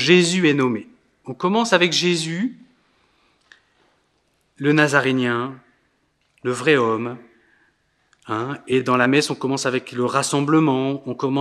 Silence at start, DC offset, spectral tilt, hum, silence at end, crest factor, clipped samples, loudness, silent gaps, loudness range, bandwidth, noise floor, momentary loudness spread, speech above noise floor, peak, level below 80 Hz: 0 s; under 0.1%; -4.5 dB/octave; none; 0 s; 22 dB; under 0.1%; -20 LUFS; none; 4 LU; 13 kHz; -66 dBFS; 12 LU; 47 dB; 0 dBFS; -70 dBFS